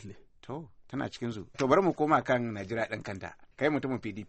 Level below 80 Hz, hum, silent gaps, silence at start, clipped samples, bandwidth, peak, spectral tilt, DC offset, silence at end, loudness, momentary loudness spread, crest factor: -62 dBFS; none; none; 0 s; under 0.1%; 8.4 kHz; -10 dBFS; -6.5 dB/octave; under 0.1%; 0 s; -30 LUFS; 17 LU; 20 dB